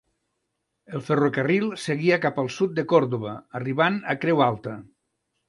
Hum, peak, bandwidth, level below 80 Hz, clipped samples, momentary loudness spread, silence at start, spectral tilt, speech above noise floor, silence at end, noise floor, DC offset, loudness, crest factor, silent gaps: none; -6 dBFS; 11.5 kHz; -66 dBFS; under 0.1%; 12 LU; 0.9 s; -6.5 dB/octave; 55 dB; 0.65 s; -78 dBFS; under 0.1%; -23 LUFS; 20 dB; none